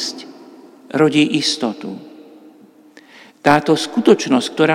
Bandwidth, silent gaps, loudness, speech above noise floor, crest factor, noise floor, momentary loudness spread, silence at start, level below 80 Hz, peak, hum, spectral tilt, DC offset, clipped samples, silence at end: 15 kHz; none; -16 LUFS; 31 dB; 18 dB; -46 dBFS; 18 LU; 0 s; -62 dBFS; 0 dBFS; none; -4.5 dB/octave; under 0.1%; under 0.1%; 0 s